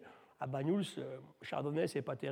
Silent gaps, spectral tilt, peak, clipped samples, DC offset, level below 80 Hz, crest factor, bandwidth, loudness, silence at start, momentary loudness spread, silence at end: none; -6.5 dB/octave; -22 dBFS; under 0.1%; under 0.1%; -82 dBFS; 16 dB; 16 kHz; -39 LUFS; 0 s; 11 LU; 0 s